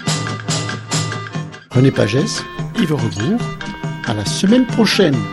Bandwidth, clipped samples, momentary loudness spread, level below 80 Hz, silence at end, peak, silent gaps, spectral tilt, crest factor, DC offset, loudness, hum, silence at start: 13 kHz; under 0.1%; 12 LU; -44 dBFS; 0 s; 0 dBFS; none; -5 dB/octave; 16 dB; under 0.1%; -17 LUFS; none; 0 s